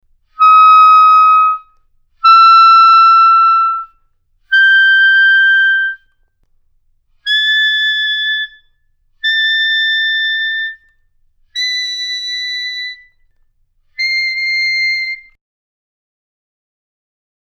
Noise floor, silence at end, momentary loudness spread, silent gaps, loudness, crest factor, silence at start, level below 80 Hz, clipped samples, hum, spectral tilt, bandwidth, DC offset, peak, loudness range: -57 dBFS; 2.25 s; 15 LU; none; -9 LUFS; 12 dB; 0.4 s; -58 dBFS; under 0.1%; none; 6.5 dB/octave; 7.6 kHz; under 0.1%; 0 dBFS; 11 LU